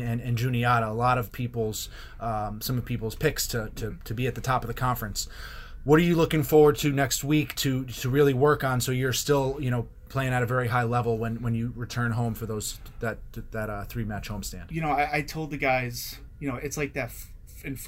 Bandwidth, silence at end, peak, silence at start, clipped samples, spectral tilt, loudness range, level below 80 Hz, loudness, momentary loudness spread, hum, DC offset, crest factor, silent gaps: 16 kHz; 0 s; -6 dBFS; 0 s; under 0.1%; -5.5 dB/octave; 8 LU; -42 dBFS; -27 LUFS; 14 LU; none; under 0.1%; 20 dB; none